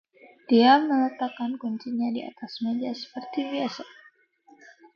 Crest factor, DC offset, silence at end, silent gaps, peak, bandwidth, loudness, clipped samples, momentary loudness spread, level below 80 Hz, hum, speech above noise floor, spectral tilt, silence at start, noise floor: 20 dB; under 0.1%; 1.1 s; none; -6 dBFS; 6.8 kHz; -25 LUFS; under 0.1%; 16 LU; -76 dBFS; none; 34 dB; -5.5 dB/octave; 0.5 s; -59 dBFS